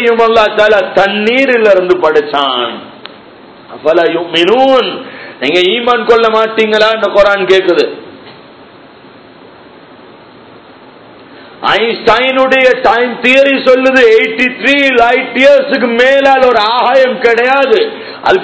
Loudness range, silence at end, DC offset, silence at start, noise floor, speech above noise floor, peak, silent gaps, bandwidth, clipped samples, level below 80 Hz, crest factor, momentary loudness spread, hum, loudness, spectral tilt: 7 LU; 0 s; under 0.1%; 0 s; -36 dBFS; 28 dB; 0 dBFS; none; 8 kHz; 2%; -46 dBFS; 10 dB; 6 LU; none; -8 LUFS; -4 dB/octave